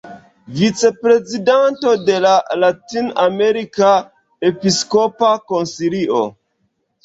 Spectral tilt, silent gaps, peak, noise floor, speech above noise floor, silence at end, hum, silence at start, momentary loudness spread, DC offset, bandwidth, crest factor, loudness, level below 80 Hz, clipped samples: -4.5 dB/octave; none; -2 dBFS; -67 dBFS; 52 dB; 0.75 s; none; 0.05 s; 6 LU; under 0.1%; 8 kHz; 14 dB; -15 LUFS; -58 dBFS; under 0.1%